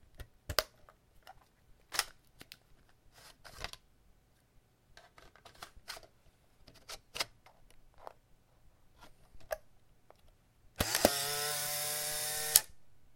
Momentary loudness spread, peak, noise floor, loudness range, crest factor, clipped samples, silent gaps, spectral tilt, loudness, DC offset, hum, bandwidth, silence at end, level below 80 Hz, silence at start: 27 LU; 0 dBFS; -67 dBFS; 21 LU; 40 dB; under 0.1%; none; -1 dB/octave; -34 LUFS; under 0.1%; none; 17 kHz; 0 s; -60 dBFS; 0.2 s